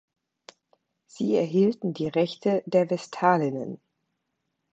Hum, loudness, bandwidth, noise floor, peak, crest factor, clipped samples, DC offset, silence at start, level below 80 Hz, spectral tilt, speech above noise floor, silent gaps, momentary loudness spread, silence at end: none; -25 LUFS; 8.2 kHz; -79 dBFS; -6 dBFS; 20 dB; under 0.1%; under 0.1%; 1.15 s; -72 dBFS; -7 dB/octave; 55 dB; none; 10 LU; 1 s